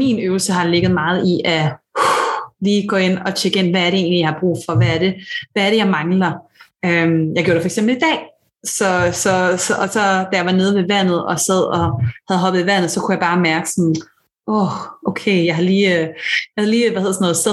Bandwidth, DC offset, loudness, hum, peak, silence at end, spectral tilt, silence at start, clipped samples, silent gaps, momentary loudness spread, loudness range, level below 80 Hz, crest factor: 12.5 kHz; under 0.1%; -16 LUFS; none; -2 dBFS; 0 s; -4.5 dB/octave; 0 s; under 0.1%; none; 6 LU; 1 LU; -54 dBFS; 14 dB